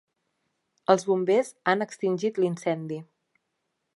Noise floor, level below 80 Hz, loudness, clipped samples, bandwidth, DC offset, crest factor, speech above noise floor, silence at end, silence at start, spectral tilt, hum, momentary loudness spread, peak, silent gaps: -79 dBFS; -80 dBFS; -26 LUFS; under 0.1%; 11.5 kHz; under 0.1%; 24 dB; 54 dB; 0.9 s; 0.9 s; -5.5 dB/octave; none; 10 LU; -4 dBFS; none